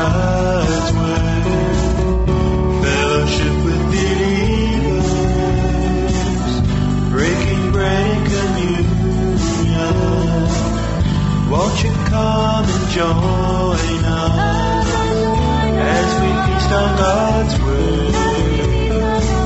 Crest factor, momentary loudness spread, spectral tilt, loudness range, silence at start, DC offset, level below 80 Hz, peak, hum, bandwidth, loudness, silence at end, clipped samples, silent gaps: 12 dB; 2 LU; -6 dB/octave; 1 LU; 0 s; under 0.1%; -22 dBFS; -2 dBFS; none; 8.2 kHz; -16 LUFS; 0 s; under 0.1%; none